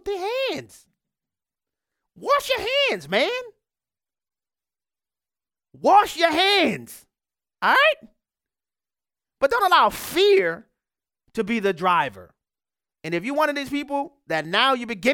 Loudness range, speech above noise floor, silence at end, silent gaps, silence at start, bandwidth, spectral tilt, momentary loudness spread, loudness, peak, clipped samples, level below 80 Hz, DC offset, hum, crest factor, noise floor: 5 LU; over 69 dB; 0 s; none; 0.05 s; 18 kHz; -3.5 dB/octave; 12 LU; -21 LUFS; -4 dBFS; under 0.1%; -60 dBFS; under 0.1%; none; 20 dB; under -90 dBFS